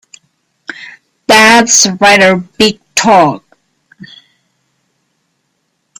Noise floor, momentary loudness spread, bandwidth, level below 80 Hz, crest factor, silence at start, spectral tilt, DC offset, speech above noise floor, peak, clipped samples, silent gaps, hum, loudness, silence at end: -64 dBFS; 23 LU; over 20 kHz; -50 dBFS; 12 dB; 0.8 s; -2 dB/octave; under 0.1%; 56 dB; 0 dBFS; 0.3%; none; none; -7 LUFS; 2.6 s